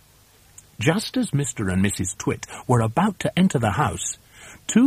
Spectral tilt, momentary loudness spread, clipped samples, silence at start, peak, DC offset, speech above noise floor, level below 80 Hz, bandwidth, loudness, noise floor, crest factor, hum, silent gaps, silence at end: -5 dB/octave; 9 LU; under 0.1%; 0.8 s; -4 dBFS; under 0.1%; 32 dB; -50 dBFS; 15.5 kHz; -23 LUFS; -54 dBFS; 18 dB; none; none; 0 s